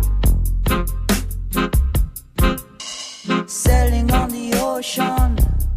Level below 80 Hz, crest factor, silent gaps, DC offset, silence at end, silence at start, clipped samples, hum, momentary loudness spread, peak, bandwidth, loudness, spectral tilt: -20 dBFS; 14 dB; none; under 0.1%; 0 s; 0 s; under 0.1%; none; 8 LU; -4 dBFS; 16 kHz; -20 LUFS; -5 dB/octave